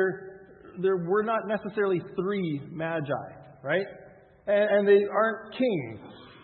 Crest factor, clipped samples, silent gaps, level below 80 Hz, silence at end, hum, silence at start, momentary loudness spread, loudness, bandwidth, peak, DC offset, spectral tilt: 18 dB; under 0.1%; none; -70 dBFS; 0.1 s; none; 0 s; 19 LU; -27 LUFS; 4.3 kHz; -10 dBFS; under 0.1%; -10.5 dB/octave